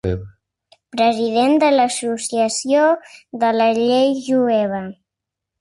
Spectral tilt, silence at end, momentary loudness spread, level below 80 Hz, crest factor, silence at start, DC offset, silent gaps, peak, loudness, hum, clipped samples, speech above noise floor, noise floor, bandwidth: -4.5 dB/octave; 0.7 s; 12 LU; -46 dBFS; 12 dB; 0.05 s; under 0.1%; none; -6 dBFS; -17 LUFS; none; under 0.1%; 66 dB; -83 dBFS; 11.5 kHz